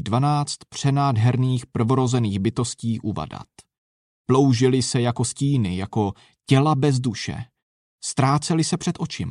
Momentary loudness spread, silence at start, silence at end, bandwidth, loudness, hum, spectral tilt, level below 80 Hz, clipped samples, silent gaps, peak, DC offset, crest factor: 12 LU; 0 s; 0 s; 11 kHz; -22 LUFS; none; -6 dB/octave; -54 dBFS; under 0.1%; 3.78-4.25 s, 7.62-7.98 s; -4 dBFS; under 0.1%; 18 dB